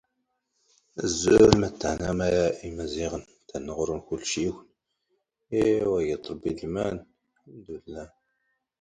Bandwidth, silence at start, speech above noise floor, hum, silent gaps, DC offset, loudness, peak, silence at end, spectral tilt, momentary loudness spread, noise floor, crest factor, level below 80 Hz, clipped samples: 11 kHz; 0.95 s; 53 dB; none; none; under 0.1%; -26 LUFS; 0 dBFS; 0.75 s; -5 dB/octave; 21 LU; -78 dBFS; 26 dB; -48 dBFS; under 0.1%